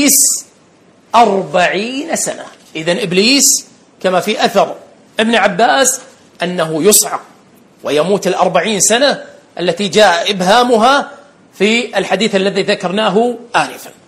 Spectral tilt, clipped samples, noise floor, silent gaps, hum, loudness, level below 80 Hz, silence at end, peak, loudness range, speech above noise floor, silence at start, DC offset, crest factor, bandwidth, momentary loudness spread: -2.5 dB/octave; 0.2%; -47 dBFS; none; none; -12 LUFS; -56 dBFS; 0.15 s; 0 dBFS; 2 LU; 35 dB; 0 s; under 0.1%; 14 dB; over 20 kHz; 12 LU